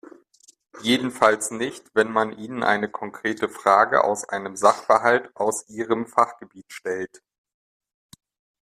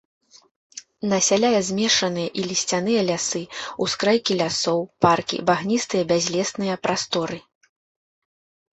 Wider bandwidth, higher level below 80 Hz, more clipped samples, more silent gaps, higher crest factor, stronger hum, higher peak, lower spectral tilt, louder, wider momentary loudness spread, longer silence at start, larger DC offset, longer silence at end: first, 15 kHz vs 8.4 kHz; second, -68 dBFS vs -62 dBFS; neither; neither; about the same, 22 dB vs 20 dB; neither; about the same, -2 dBFS vs -4 dBFS; about the same, -3.5 dB/octave vs -3.5 dB/octave; about the same, -22 LUFS vs -22 LUFS; about the same, 12 LU vs 10 LU; about the same, 0.75 s vs 0.75 s; neither; first, 1.5 s vs 1.35 s